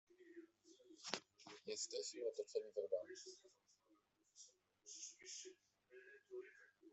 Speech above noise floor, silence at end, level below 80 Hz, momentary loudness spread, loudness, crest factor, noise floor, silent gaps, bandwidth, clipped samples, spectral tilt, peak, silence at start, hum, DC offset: 31 dB; 0 s; under -90 dBFS; 19 LU; -50 LUFS; 34 dB; -80 dBFS; none; 8.2 kHz; under 0.1%; -1 dB/octave; -20 dBFS; 0.1 s; none; under 0.1%